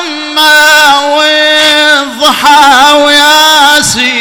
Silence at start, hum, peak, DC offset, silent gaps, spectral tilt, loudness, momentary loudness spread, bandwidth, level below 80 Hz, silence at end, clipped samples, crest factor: 0 s; none; 0 dBFS; under 0.1%; none; -0.5 dB/octave; -3 LUFS; 5 LU; over 20 kHz; -42 dBFS; 0 s; 7%; 6 dB